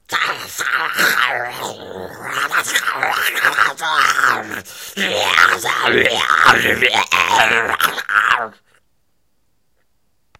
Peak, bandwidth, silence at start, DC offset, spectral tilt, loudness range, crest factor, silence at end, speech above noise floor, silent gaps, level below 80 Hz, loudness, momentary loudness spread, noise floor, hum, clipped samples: 0 dBFS; 17.5 kHz; 0.1 s; under 0.1%; -1 dB/octave; 4 LU; 18 dB; 1.9 s; 52 dB; none; -56 dBFS; -15 LUFS; 14 LU; -68 dBFS; none; under 0.1%